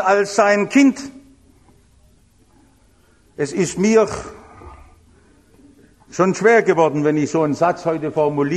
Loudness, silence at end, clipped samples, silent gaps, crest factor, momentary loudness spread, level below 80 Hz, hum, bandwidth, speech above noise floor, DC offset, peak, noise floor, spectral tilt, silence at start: -17 LUFS; 0 s; under 0.1%; none; 18 dB; 15 LU; -52 dBFS; none; 12 kHz; 38 dB; under 0.1%; -2 dBFS; -54 dBFS; -5.5 dB/octave; 0 s